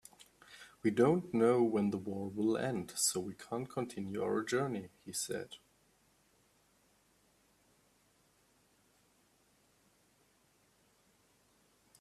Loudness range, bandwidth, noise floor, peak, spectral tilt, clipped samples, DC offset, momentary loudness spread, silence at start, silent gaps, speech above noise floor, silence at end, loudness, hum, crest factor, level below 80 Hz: 14 LU; 15 kHz; -72 dBFS; -16 dBFS; -4.5 dB/octave; under 0.1%; under 0.1%; 14 LU; 0.5 s; none; 37 dB; 6.45 s; -35 LUFS; none; 22 dB; -76 dBFS